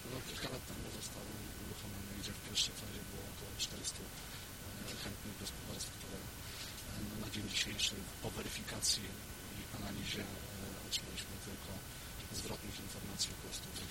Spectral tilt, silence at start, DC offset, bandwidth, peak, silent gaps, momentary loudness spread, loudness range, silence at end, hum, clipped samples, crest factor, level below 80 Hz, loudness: -2.5 dB/octave; 0 s; under 0.1%; 16.5 kHz; -22 dBFS; none; 11 LU; 5 LU; 0 s; none; under 0.1%; 22 dB; -56 dBFS; -42 LUFS